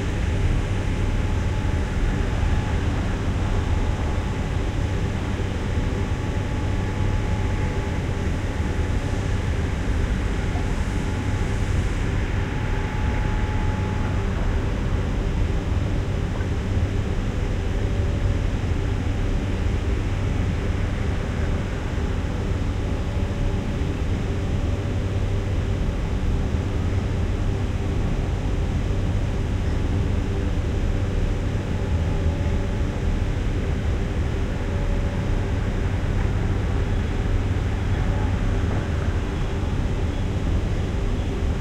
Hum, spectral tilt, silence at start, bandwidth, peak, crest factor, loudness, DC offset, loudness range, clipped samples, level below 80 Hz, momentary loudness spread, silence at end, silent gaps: none; -7 dB/octave; 0 s; 10.5 kHz; -10 dBFS; 12 dB; -25 LUFS; under 0.1%; 1 LU; under 0.1%; -26 dBFS; 2 LU; 0 s; none